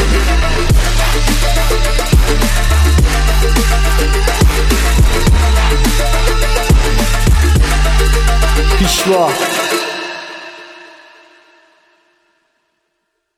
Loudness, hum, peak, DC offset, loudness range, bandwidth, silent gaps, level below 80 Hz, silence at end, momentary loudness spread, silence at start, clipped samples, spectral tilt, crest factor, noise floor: -13 LUFS; none; 0 dBFS; under 0.1%; 6 LU; 15.5 kHz; none; -12 dBFS; 2.6 s; 4 LU; 0 s; under 0.1%; -4.5 dB/octave; 12 dB; -69 dBFS